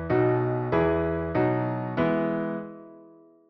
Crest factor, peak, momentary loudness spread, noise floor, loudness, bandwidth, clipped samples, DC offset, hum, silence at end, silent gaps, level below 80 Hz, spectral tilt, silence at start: 14 dB; -12 dBFS; 10 LU; -53 dBFS; -26 LUFS; 5.8 kHz; under 0.1%; under 0.1%; none; 0.4 s; none; -48 dBFS; -11 dB/octave; 0 s